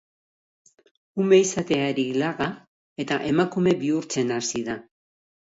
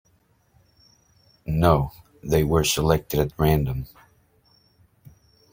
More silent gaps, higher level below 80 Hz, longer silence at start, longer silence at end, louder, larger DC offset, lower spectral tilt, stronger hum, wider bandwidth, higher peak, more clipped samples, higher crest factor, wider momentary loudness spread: first, 2.67-2.96 s vs none; second, -62 dBFS vs -38 dBFS; second, 1.15 s vs 1.45 s; second, 0.7 s vs 1.65 s; about the same, -24 LUFS vs -22 LUFS; neither; about the same, -5 dB/octave vs -5.5 dB/octave; neither; second, 8 kHz vs 16.5 kHz; second, -6 dBFS vs -2 dBFS; neither; about the same, 18 dB vs 22 dB; about the same, 16 LU vs 15 LU